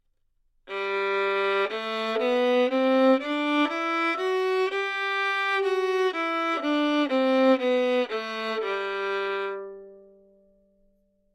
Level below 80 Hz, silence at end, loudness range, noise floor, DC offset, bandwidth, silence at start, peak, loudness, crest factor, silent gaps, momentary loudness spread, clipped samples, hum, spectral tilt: -70 dBFS; 1.35 s; 4 LU; -69 dBFS; under 0.1%; 13 kHz; 0.65 s; -12 dBFS; -25 LUFS; 14 dB; none; 8 LU; under 0.1%; none; -3.5 dB/octave